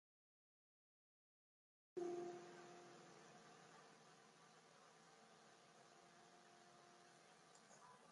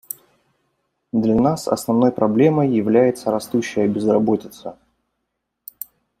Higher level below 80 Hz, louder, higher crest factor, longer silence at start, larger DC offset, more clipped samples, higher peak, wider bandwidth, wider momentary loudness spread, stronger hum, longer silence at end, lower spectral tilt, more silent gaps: second, under -90 dBFS vs -56 dBFS; second, -60 LUFS vs -18 LUFS; first, 24 dB vs 18 dB; first, 1.95 s vs 1.15 s; neither; neither; second, -38 dBFS vs -2 dBFS; second, 11 kHz vs 16 kHz; second, 15 LU vs 19 LU; neither; second, 0 s vs 1.45 s; second, -4.5 dB/octave vs -7 dB/octave; neither